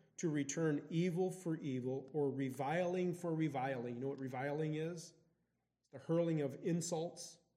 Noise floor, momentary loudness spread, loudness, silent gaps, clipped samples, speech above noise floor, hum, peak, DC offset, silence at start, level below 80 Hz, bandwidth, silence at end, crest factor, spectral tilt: -85 dBFS; 7 LU; -40 LUFS; none; under 0.1%; 45 dB; none; -24 dBFS; under 0.1%; 0.2 s; -86 dBFS; 15 kHz; 0.2 s; 16 dB; -6 dB/octave